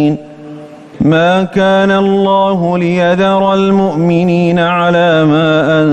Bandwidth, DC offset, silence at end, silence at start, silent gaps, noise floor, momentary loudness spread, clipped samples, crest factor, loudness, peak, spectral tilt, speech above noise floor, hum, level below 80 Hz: 8.6 kHz; under 0.1%; 0 s; 0 s; none; -30 dBFS; 6 LU; under 0.1%; 8 dB; -10 LUFS; -2 dBFS; -7.5 dB/octave; 21 dB; none; -44 dBFS